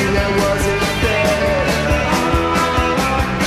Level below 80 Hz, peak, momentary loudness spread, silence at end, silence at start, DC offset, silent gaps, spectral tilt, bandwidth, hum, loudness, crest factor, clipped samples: -26 dBFS; -4 dBFS; 1 LU; 0 s; 0 s; under 0.1%; none; -5 dB/octave; 15.5 kHz; none; -16 LUFS; 12 dB; under 0.1%